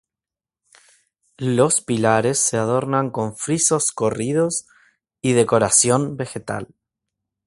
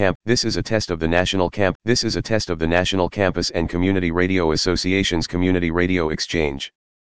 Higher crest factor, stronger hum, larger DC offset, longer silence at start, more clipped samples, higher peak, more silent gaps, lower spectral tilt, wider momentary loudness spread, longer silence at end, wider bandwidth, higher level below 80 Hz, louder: about the same, 20 dB vs 20 dB; neither; second, under 0.1% vs 2%; first, 1.4 s vs 0 s; neither; about the same, -2 dBFS vs 0 dBFS; second, none vs 0.15-0.20 s, 1.75-1.80 s; about the same, -4 dB/octave vs -5 dB/octave; first, 13 LU vs 4 LU; first, 0.8 s vs 0.45 s; first, 11.5 kHz vs 10 kHz; second, -56 dBFS vs -38 dBFS; about the same, -19 LUFS vs -20 LUFS